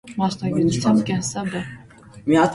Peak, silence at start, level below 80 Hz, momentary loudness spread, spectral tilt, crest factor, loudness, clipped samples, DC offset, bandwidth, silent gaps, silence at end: -6 dBFS; 0.05 s; -52 dBFS; 12 LU; -5.5 dB/octave; 16 dB; -21 LUFS; under 0.1%; under 0.1%; 11.5 kHz; none; 0 s